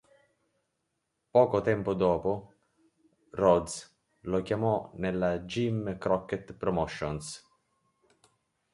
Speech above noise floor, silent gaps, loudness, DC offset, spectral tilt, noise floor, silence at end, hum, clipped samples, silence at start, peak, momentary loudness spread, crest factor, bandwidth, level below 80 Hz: 52 dB; none; -29 LUFS; under 0.1%; -6.5 dB/octave; -81 dBFS; 1.35 s; none; under 0.1%; 1.35 s; -10 dBFS; 14 LU; 22 dB; 11.5 kHz; -56 dBFS